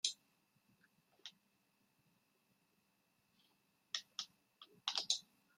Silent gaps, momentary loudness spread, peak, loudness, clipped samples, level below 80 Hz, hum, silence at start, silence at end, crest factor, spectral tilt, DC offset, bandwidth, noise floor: none; 19 LU; -18 dBFS; -43 LUFS; under 0.1%; under -90 dBFS; none; 0.05 s; 0.35 s; 32 dB; 2.5 dB/octave; under 0.1%; 16 kHz; -80 dBFS